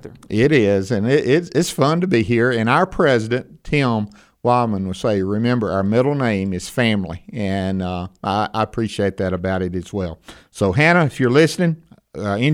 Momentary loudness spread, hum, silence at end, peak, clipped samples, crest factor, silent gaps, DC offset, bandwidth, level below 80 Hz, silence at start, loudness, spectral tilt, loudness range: 11 LU; none; 0 s; -2 dBFS; under 0.1%; 18 dB; none; under 0.1%; 16 kHz; -46 dBFS; 0.05 s; -19 LUFS; -6.5 dB/octave; 5 LU